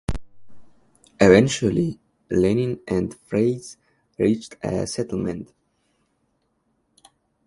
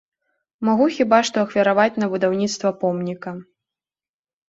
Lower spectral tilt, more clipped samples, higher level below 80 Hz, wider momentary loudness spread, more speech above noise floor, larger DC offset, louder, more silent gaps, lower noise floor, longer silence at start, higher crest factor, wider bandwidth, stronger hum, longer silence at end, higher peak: about the same, -6 dB/octave vs -5 dB/octave; neither; first, -44 dBFS vs -64 dBFS; first, 19 LU vs 12 LU; second, 48 dB vs over 71 dB; neither; second, -22 LUFS vs -19 LUFS; neither; second, -70 dBFS vs under -90 dBFS; second, 0.1 s vs 0.6 s; about the same, 22 dB vs 18 dB; first, 11.5 kHz vs 8 kHz; neither; first, 2 s vs 1.05 s; about the same, 0 dBFS vs -2 dBFS